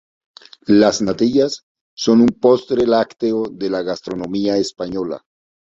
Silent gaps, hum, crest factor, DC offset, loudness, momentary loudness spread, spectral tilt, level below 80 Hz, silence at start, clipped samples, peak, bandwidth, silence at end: 1.63-1.75 s, 1.81-1.97 s; none; 16 dB; under 0.1%; -17 LUFS; 12 LU; -5.5 dB/octave; -52 dBFS; 0.7 s; under 0.1%; -2 dBFS; 7.8 kHz; 0.5 s